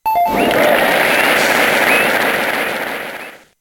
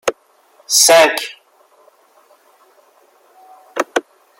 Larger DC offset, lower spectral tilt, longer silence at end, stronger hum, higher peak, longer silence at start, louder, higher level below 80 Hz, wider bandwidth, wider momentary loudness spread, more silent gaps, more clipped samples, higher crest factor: neither; first, -2.5 dB/octave vs 0.5 dB/octave; second, 0.25 s vs 0.4 s; neither; about the same, 0 dBFS vs 0 dBFS; about the same, 0.05 s vs 0.05 s; about the same, -13 LUFS vs -13 LUFS; first, -48 dBFS vs -68 dBFS; about the same, 17.5 kHz vs 16.5 kHz; second, 13 LU vs 18 LU; neither; neither; about the same, 14 dB vs 18 dB